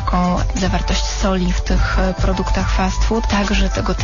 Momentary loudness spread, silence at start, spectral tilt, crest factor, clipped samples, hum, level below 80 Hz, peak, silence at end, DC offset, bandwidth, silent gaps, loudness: 2 LU; 0 s; -5 dB/octave; 10 dB; under 0.1%; none; -20 dBFS; -6 dBFS; 0 s; 0.5%; 7.4 kHz; none; -18 LUFS